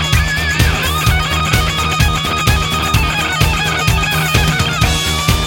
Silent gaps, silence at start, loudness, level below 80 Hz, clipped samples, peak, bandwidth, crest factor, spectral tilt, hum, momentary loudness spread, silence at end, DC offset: none; 0 s; -14 LUFS; -20 dBFS; under 0.1%; 0 dBFS; 17 kHz; 14 dB; -3.5 dB/octave; none; 1 LU; 0 s; under 0.1%